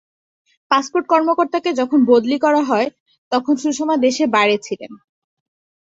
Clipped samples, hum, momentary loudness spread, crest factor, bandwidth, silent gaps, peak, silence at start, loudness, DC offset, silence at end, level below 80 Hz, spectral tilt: under 0.1%; none; 8 LU; 16 dB; 8 kHz; 3.00-3.06 s, 3.18-3.31 s; -2 dBFS; 0.7 s; -17 LUFS; under 0.1%; 0.9 s; -64 dBFS; -4 dB/octave